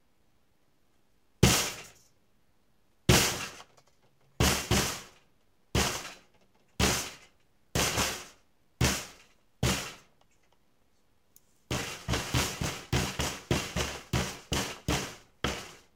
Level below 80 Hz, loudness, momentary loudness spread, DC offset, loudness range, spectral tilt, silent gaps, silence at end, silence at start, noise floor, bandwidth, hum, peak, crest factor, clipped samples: -44 dBFS; -30 LUFS; 16 LU; under 0.1%; 6 LU; -3.5 dB/octave; none; 0.2 s; 1.4 s; -72 dBFS; 16.5 kHz; none; -6 dBFS; 28 dB; under 0.1%